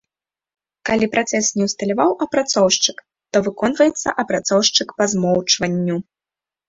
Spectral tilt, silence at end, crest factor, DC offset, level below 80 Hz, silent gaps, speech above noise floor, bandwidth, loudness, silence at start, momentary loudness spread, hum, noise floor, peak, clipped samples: -3 dB/octave; 0.65 s; 18 dB; under 0.1%; -56 dBFS; none; 71 dB; 8 kHz; -18 LUFS; 0.85 s; 6 LU; none; -89 dBFS; -2 dBFS; under 0.1%